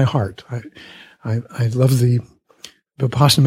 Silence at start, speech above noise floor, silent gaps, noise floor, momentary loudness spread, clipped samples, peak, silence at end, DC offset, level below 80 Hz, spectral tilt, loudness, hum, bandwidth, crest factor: 0 s; 27 dB; none; -45 dBFS; 25 LU; under 0.1%; -2 dBFS; 0 s; under 0.1%; -50 dBFS; -6 dB/octave; -19 LUFS; none; 16 kHz; 16 dB